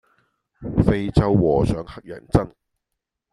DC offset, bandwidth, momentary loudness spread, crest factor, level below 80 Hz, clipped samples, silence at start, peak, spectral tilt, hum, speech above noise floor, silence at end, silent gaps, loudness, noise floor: under 0.1%; 11.5 kHz; 18 LU; 20 dB; -34 dBFS; under 0.1%; 0.6 s; -2 dBFS; -8.5 dB/octave; none; 62 dB; 0.85 s; none; -20 LUFS; -82 dBFS